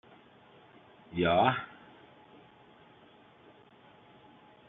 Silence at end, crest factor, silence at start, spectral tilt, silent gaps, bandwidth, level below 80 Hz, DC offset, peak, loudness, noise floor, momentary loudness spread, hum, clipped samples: 3.05 s; 26 dB; 1.1 s; -4 dB/octave; none; 4.2 kHz; -68 dBFS; under 0.1%; -10 dBFS; -29 LUFS; -59 dBFS; 28 LU; none; under 0.1%